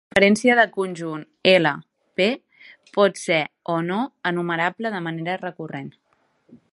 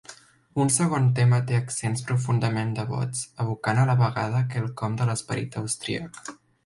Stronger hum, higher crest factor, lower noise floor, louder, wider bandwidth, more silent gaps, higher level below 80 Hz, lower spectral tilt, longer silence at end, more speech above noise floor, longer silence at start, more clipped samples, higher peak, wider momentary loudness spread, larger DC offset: neither; first, 22 dB vs 16 dB; first, -62 dBFS vs -49 dBFS; first, -21 LUFS vs -25 LUFS; about the same, 11.5 kHz vs 11.5 kHz; neither; about the same, -62 dBFS vs -58 dBFS; about the same, -5 dB/octave vs -5.5 dB/octave; second, 0.15 s vs 0.3 s; first, 41 dB vs 25 dB; about the same, 0.15 s vs 0.1 s; neither; first, 0 dBFS vs -8 dBFS; first, 16 LU vs 10 LU; neither